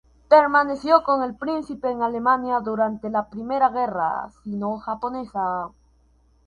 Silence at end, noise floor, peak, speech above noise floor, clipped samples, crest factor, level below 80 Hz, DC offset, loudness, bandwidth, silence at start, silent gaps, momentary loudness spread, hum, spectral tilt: 0.8 s; -59 dBFS; -2 dBFS; 37 dB; under 0.1%; 20 dB; -56 dBFS; under 0.1%; -22 LUFS; 9.8 kHz; 0.3 s; none; 11 LU; none; -7 dB/octave